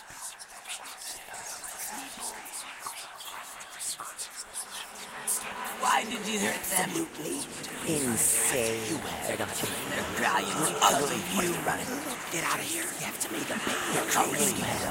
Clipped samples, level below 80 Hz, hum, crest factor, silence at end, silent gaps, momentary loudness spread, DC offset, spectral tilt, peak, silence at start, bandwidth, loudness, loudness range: under 0.1%; -62 dBFS; none; 24 dB; 0 s; none; 15 LU; under 0.1%; -2 dB/octave; -8 dBFS; 0 s; 16.5 kHz; -30 LUFS; 10 LU